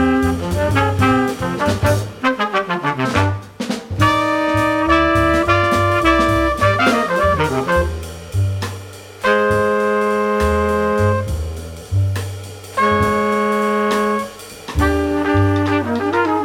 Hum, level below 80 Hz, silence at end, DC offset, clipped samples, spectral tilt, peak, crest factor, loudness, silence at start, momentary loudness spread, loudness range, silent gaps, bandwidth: none; -32 dBFS; 0 s; under 0.1%; under 0.1%; -6 dB/octave; -2 dBFS; 16 dB; -17 LUFS; 0 s; 11 LU; 4 LU; none; 16.5 kHz